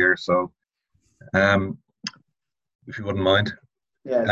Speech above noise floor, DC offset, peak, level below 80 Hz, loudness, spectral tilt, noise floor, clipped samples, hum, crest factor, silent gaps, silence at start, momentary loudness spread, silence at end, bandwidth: 60 dB; under 0.1%; -4 dBFS; -48 dBFS; -23 LUFS; -5.5 dB/octave; -82 dBFS; under 0.1%; none; 20 dB; 2.75-2.79 s; 0 s; 17 LU; 0 s; 7.8 kHz